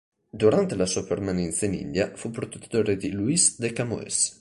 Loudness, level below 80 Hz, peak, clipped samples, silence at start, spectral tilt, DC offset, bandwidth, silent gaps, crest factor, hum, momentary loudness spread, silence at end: -25 LUFS; -50 dBFS; -6 dBFS; under 0.1%; 0.35 s; -4 dB/octave; under 0.1%; 11.5 kHz; none; 18 dB; none; 9 LU; 0.05 s